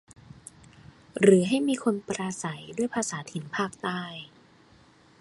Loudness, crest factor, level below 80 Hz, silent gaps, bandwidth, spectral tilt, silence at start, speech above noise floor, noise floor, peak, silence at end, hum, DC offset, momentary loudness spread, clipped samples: -27 LUFS; 24 dB; -66 dBFS; none; 11.5 kHz; -5 dB/octave; 1.15 s; 31 dB; -57 dBFS; -6 dBFS; 0.95 s; none; under 0.1%; 27 LU; under 0.1%